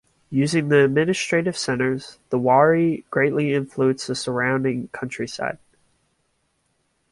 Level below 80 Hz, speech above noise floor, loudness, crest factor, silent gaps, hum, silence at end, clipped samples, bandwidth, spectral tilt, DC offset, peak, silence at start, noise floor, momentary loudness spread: -60 dBFS; 49 dB; -21 LUFS; 18 dB; none; none; 1.55 s; under 0.1%; 11.5 kHz; -5.5 dB/octave; under 0.1%; -4 dBFS; 0.3 s; -69 dBFS; 12 LU